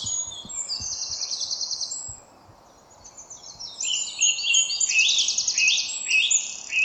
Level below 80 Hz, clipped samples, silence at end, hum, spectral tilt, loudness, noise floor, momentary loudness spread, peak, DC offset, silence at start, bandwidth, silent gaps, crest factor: -60 dBFS; under 0.1%; 0 s; none; 3 dB/octave; -22 LUFS; -52 dBFS; 18 LU; -6 dBFS; under 0.1%; 0 s; 11 kHz; none; 18 dB